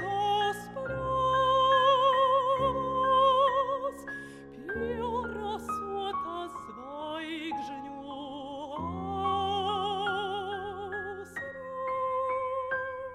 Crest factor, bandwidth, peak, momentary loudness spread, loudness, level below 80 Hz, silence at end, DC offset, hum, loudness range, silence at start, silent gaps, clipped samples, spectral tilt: 16 dB; 13 kHz; -14 dBFS; 16 LU; -30 LUFS; -56 dBFS; 0 s; under 0.1%; none; 11 LU; 0 s; none; under 0.1%; -5 dB/octave